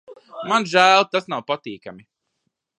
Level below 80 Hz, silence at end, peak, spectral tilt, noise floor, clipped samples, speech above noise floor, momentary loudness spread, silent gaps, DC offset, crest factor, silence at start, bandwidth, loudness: -74 dBFS; 0.8 s; 0 dBFS; -3 dB/octave; -75 dBFS; under 0.1%; 56 dB; 20 LU; none; under 0.1%; 22 dB; 0.1 s; 11 kHz; -18 LUFS